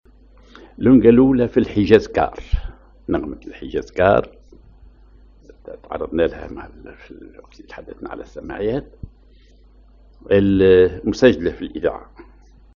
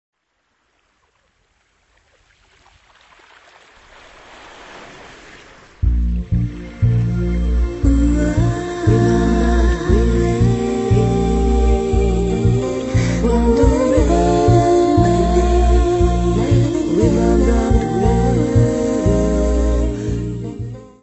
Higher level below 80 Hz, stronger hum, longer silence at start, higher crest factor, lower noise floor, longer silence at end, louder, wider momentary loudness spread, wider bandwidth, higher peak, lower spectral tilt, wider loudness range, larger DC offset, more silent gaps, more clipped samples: second, -36 dBFS vs -22 dBFS; neither; second, 0.8 s vs 4.3 s; about the same, 20 dB vs 16 dB; second, -49 dBFS vs -67 dBFS; first, 0.75 s vs 0.2 s; about the same, -17 LUFS vs -16 LUFS; first, 25 LU vs 7 LU; second, 7.2 kHz vs 8.4 kHz; about the same, 0 dBFS vs 0 dBFS; second, -6 dB/octave vs -7.5 dB/octave; first, 14 LU vs 7 LU; neither; neither; neither